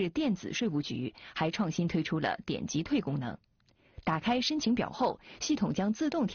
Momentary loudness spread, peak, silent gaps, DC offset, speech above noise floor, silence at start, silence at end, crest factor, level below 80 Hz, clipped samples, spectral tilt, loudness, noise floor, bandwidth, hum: 8 LU; -16 dBFS; none; under 0.1%; 24 dB; 0 s; 0 s; 14 dB; -60 dBFS; under 0.1%; -4.5 dB/octave; -32 LUFS; -55 dBFS; 6.8 kHz; none